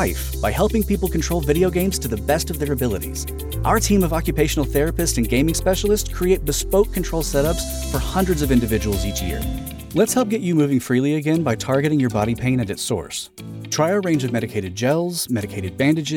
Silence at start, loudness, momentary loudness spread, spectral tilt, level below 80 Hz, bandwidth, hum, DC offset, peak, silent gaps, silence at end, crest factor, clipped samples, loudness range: 0 s; -20 LUFS; 7 LU; -5 dB/octave; -30 dBFS; 18.5 kHz; none; under 0.1%; -6 dBFS; none; 0 s; 14 dB; under 0.1%; 2 LU